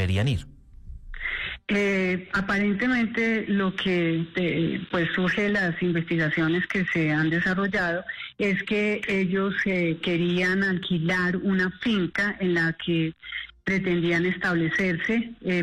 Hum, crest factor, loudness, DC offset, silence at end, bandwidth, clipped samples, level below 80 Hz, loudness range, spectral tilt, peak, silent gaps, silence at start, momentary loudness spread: none; 10 dB; -25 LUFS; under 0.1%; 0 s; 10 kHz; under 0.1%; -50 dBFS; 1 LU; -6.5 dB/octave; -16 dBFS; none; 0 s; 4 LU